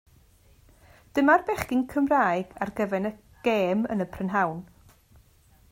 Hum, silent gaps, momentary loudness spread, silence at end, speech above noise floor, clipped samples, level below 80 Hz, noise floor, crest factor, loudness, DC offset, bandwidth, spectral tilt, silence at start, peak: none; none; 10 LU; 1.1 s; 34 dB; under 0.1%; -56 dBFS; -59 dBFS; 20 dB; -26 LUFS; under 0.1%; 16 kHz; -6.5 dB/octave; 1.15 s; -8 dBFS